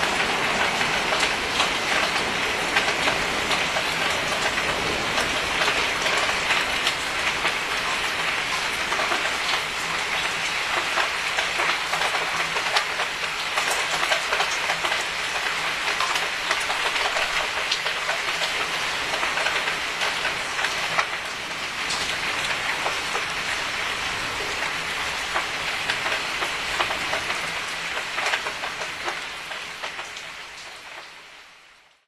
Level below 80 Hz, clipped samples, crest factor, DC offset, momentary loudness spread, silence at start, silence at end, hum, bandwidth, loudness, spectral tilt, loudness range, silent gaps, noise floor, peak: -50 dBFS; under 0.1%; 20 dB; under 0.1%; 7 LU; 0 s; 0.4 s; none; 14 kHz; -23 LUFS; -1 dB/octave; 3 LU; none; -53 dBFS; -4 dBFS